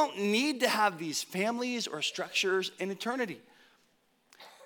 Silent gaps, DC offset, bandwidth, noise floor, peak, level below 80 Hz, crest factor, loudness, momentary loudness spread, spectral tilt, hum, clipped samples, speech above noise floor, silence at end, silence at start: none; under 0.1%; 19 kHz; -70 dBFS; -10 dBFS; under -90 dBFS; 22 dB; -31 LUFS; 8 LU; -3 dB/octave; none; under 0.1%; 39 dB; 0 s; 0 s